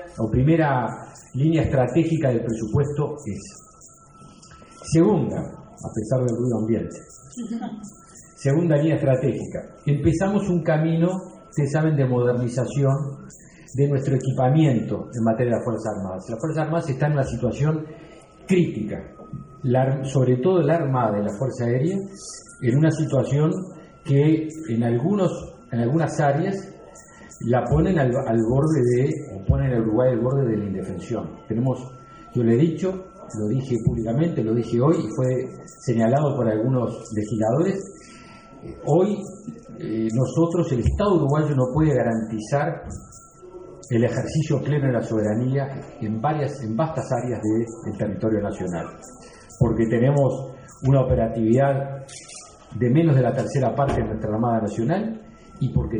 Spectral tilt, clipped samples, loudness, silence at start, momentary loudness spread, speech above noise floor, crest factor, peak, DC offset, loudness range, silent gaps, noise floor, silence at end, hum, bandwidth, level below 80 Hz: -8 dB/octave; under 0.1%; -22 LUFS; 0 s; 15 LU; 27 dB; 18 dB; -4 dBFS; under 0.1%; 3 LU; none; -49 dBFS; 0 s; none; 10 kHz; -42 dBFS